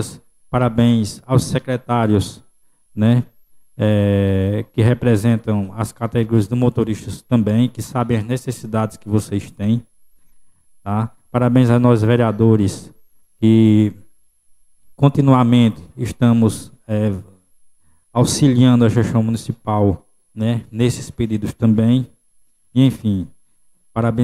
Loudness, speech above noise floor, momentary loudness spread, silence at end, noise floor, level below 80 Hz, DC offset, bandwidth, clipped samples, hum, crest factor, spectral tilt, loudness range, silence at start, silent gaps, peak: -17 LUFS; 39 dB; 11 LU; 0 s; -55 dBFS; -46 dBFS; under 0.1%; 13.5 kHz; under 0.1%; none; 16 dB; -7.5 dB/octave; 4 LU; 0 s; none; -2 dBFS